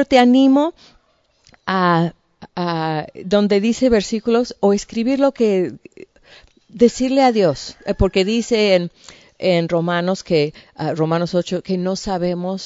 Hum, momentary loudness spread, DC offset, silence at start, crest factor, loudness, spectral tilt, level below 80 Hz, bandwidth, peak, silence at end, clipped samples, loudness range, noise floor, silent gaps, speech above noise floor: none; 10 LU; under 0.1%; 0 s; 18 dB; -18 LUFS; -6 dB/octave; -40 dBFS; 8 kHz; 0 dBFS; 0 s; under 0.1%; 2 LU; -61 dBFS; none; 43 dB